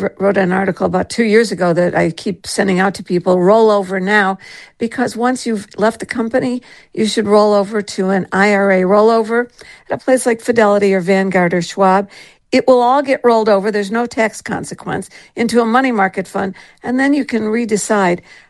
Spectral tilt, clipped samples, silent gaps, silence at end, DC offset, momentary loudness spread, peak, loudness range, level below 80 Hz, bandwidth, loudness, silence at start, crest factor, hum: -5.5 dB/octave; under 0.1%; none; 0.3 s; under 0.1%; 12 LU; 0 dBFS; 4 LU; -54 dBFS; 12.5 kHz; -14 LUFS; 0 s; 14 dB; none